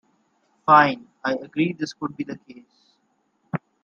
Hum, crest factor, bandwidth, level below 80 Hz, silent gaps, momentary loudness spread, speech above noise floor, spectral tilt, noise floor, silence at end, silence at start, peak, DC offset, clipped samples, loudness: none; 22 dB; 7.4 kHz; -68 dBFS; none; 18 LU; 47 dB; -6 dB/octave; -69 dBFS; 0.25 s; 0.65 s; -2 dBFS; under 0.1%; under 0.1%; -22 LUFS